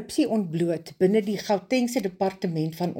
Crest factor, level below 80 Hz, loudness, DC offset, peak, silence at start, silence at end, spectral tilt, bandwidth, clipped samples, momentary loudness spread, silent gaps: 16 dB; -66 dBFS; -25 LUFS; under 0.1%; -10 dBFS; 0 s; 0 s; -6 dB/octave; 17 kHz; under 0.1%; 5 LU; none